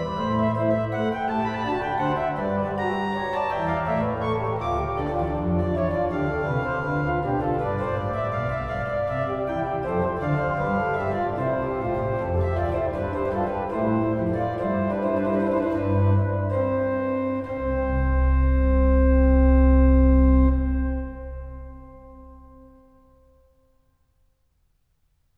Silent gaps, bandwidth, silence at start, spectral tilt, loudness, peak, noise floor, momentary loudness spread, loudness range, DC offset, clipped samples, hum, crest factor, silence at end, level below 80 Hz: none; 4.9 kHz; 0 s; -9.5 dB/octave; -24 LUFS; -8 dBFS; -67 dBFS; 8 LU; 6 LU; under 0.1%; under 0.1%; none; 16 dB; 2.75 s; -28 dBFS